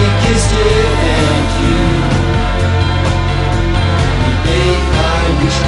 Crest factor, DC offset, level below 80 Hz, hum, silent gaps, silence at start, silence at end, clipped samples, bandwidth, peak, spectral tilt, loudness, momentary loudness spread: 10 dB; under 0.1%; -16 dBFS; none; none; 0 s; 0 s; under 0.1%; 11.5 kHz; 0 dBFS; -5.5 dB/octave; -13 LUFS; 3 LU